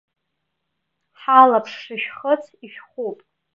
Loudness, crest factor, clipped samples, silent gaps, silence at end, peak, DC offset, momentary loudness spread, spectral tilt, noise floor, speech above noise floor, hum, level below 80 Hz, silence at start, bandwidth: -17 LUFS; 20 dB; under 0.1%; none; 0.4 s; 0 dBFS; under 0.1%; 18 LU; -5 dB/octave; -77 dBFS; 58 dB; none; -78 dBFS; 1.3 s; 7 kHz